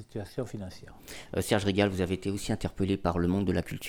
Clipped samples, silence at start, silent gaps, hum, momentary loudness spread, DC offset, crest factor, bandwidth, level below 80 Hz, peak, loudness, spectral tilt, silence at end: under 0.1%; 0 s; none; none; 16 LU; under 0.1%; 20 dB; 19 kHz; -48 dBFS; -10 dBFS; -30 LUFS; -6 dB/octave; 0 s